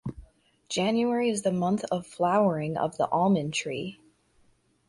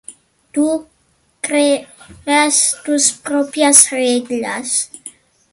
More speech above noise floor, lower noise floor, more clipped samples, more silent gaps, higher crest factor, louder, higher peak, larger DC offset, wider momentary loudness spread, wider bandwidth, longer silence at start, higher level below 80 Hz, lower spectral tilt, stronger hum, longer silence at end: second, 39 dB vs 44 dB; first, -65 dBFS vs -59 dBFS; second, under 0.1% vs 0.1%; neither; about the same, 16 dB vs 16 dB; second, -27 LUFS vs -14 LUFS; second, -12 dBFS vs 0 dBFS; neither; second, 10 LU vs 16 LU; second, 11.5 kHz vs 16 kHz; about the same, 0.05 s vs 0.1 s; about the same, -60 dBFS vs -60 dBFS; first, -5.5 dB/octave vs -0.5 dB/octave; neither; first, 0.95 s vs 0.45 s